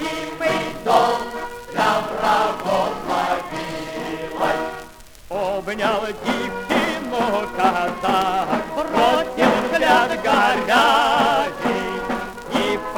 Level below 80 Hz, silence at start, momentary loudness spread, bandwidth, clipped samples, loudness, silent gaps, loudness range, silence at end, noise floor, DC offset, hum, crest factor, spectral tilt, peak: -46 dBFS; 0 s; 11 LU; over 20 kHz; under 0.1%; -20 LUFS; none; 7 LU; 0 s; -40 dBFS; under 0.1%; none; 18 dB; -4 dB/octave; -2 dBFS